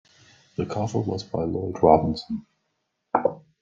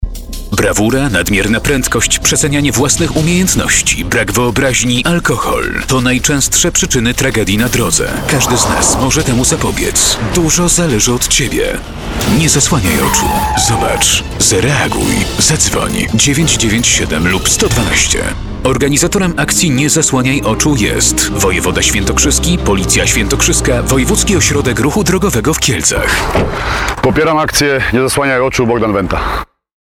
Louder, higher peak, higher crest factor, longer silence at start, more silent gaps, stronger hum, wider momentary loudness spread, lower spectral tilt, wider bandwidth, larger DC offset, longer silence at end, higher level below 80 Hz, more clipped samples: second, -25 LUFS vs -11 LUFS; about the same, -2 dBFS vs 0 dBFS; first, 24 dB vs 12 dB; first, 0.6 s vs 0 s; neither; neither; first, 15 LU vs 4 LU; first, -7.5 dB/octave vs -3.5 dB/octave; second, 7.6 kHz vs 19.5 kHz; neither; second, 0.2 s vs 0.35 s; second, -52 dBFS vs -24 dBFS; neither